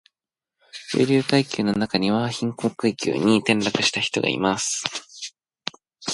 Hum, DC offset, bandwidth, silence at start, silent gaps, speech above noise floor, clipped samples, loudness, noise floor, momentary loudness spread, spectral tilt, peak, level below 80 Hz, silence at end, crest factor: none; under 0.1%; 11.5 kHz; 0.75 s; none; 66 dB; under 0.1%; -22 LUFS; -87 dBFS; 15 LU; -4 dB/octave; -2 dBFS; -60 dBFS; 0 s; 22 dB